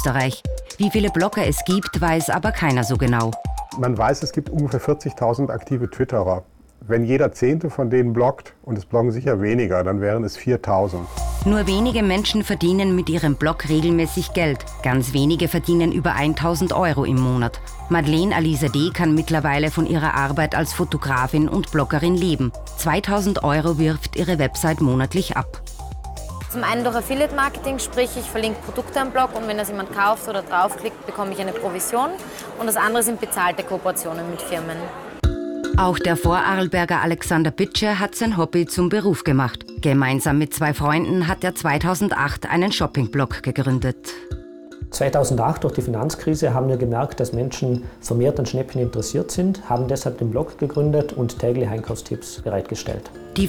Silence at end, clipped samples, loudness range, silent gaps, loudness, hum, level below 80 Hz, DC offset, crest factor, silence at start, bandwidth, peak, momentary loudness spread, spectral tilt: 0 s; under 0.1%; 3 LU; none; -21 LUFS; none; -36 dBFS; under 0.1%; 12 dB; 0 s; 19.5 kHz; -8 dBFS; 8 LU; -5.5 dB/octave